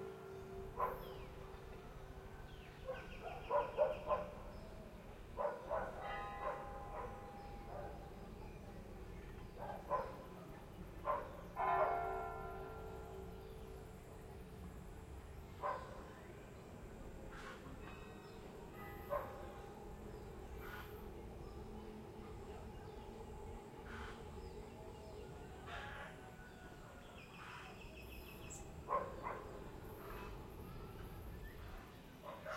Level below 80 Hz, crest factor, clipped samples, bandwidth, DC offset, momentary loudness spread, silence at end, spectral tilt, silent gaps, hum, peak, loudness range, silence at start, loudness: -58 dBFS; 24 dB; under 0.1%; 16 kHz; under 0.1%; 13 LU; 0 s; -6 dB/octave; none; none; -24 dBFS; 10 LU; 0 s; -48 LUFS